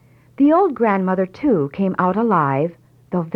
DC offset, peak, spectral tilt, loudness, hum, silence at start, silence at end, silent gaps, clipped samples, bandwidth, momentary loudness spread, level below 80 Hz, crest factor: under 0.1%; -4 dBFS; -10 dB/octave; -18 LUFS; none; 0.4 s; 0 s; none; under 0.1%; 5.6 kHz; 8 LU; -56 dBFS; 14 dB